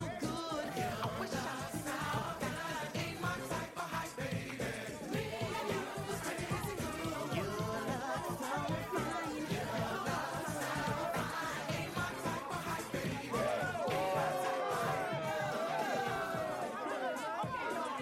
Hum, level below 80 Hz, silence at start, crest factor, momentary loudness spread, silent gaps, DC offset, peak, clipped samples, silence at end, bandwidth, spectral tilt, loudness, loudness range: none; -60 dBFS; 0 s; 14 dB; 4 LU; none; under 0.1%; -24 dBFS; under 0.1%; 0 s; 16 kHz; -4.5 dB/octave; -38 LUFS; 3 LU